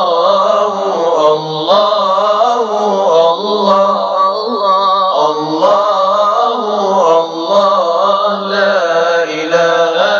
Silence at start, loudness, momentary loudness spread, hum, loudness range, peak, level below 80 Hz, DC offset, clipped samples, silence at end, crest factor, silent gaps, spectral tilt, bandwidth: 0 s; -11 LUFS; 3 LU; none; 0 LU; 0 dBFS; -72 dBFS; under 0.1%; under 0.1%; 0 s; 12 dB; none; -4 dB/octave; 7.2 kHz